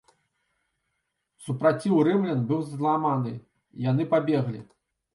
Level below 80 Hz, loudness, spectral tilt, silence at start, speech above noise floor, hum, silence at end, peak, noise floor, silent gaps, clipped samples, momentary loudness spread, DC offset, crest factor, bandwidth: -70 dBFS; -25 LUFS; -8.5 dB/octave; 1.4 s; 54 dB; none; 0.5 s; -10 dBFS; -79 dBFS; none; under 0.1%; 13 LU; under 0.1%; 18 dB; 11.5 kHz